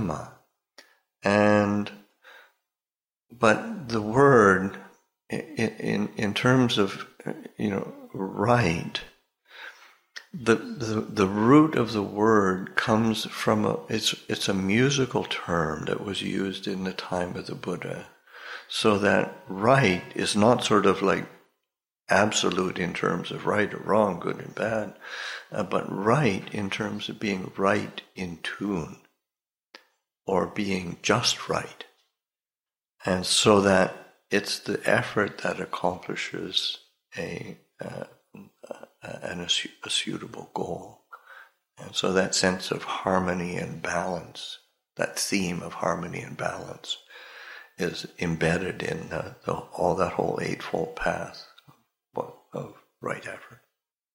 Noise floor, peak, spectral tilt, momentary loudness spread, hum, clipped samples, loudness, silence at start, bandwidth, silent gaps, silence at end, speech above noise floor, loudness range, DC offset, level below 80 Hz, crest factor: under -90 dBFS; -4 dBFS; -4.5 dB/octave; 17 LU; none; under 0.1%; -26 LUFS; 0 s; 16.5 kHz; none; 0.6 s; over 64 dB; 8 LU; under 0.1%; -58 dBFS; 22 dB